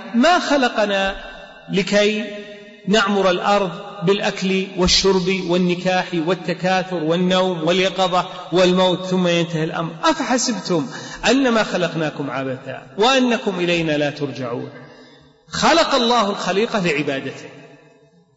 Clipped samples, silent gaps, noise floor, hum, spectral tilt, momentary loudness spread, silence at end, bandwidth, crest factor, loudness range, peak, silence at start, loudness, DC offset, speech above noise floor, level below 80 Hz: under 0.1%; none; -52 dBFS; none; -4.5 dB/octave; 12 LU; 0.7 s; 8 kHz; 16 dB; 2 LU; -2 dBFS; 0 s; -18 LUFS; under 0.1%; 34 dB; -46 dBFS